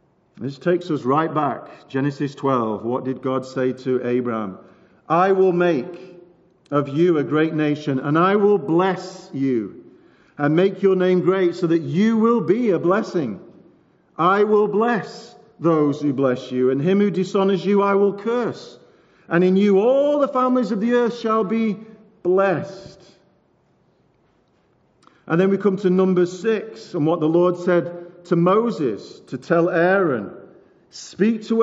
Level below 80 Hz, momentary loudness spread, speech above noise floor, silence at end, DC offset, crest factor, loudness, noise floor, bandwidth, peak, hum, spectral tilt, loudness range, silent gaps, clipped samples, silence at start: -72 dBFS; 12 LU; 42 dB; 0 s; under 0.1%; 16 dB; -20 LUFS; -61 dBFS; 7.8 kHz; -4 dBFS; none; -6.5 dB/octave; 4 LU; none; under 0.1%; 0.4 s